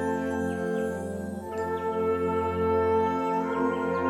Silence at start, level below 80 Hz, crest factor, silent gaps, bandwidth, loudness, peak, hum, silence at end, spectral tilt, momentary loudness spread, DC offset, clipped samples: 0 s; -52 dBFS; 14 dB; none; 14 kHz; -28 LUFS; -14 dBFS; none; 0 s; -7 dB/octave; 8 LU; under 0.1%; under 0.1%